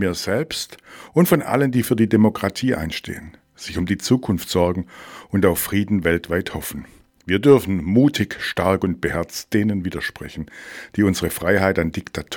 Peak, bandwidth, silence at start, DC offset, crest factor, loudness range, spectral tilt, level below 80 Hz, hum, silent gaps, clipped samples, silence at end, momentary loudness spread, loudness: -2 dBFS; 19 kHz; 0 s; under 0.1%; 18 dB; 3 LU; -5.5 dB/octave; -44 dBFS; none; none; under 0.1%; 0 s; 16 LU; -20 LUFS